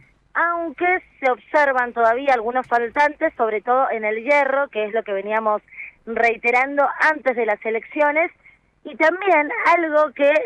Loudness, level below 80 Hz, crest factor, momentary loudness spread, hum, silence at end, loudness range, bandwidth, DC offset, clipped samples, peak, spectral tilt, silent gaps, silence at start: -19 LUFS; -62 dBFS; 14 dB; 7 LU; none; 0 s; 1 LU; 9.8 kHz; under 0.1%; under 0.1%; -6 dBFS; -4.5 dB/octave; none; 0.35 s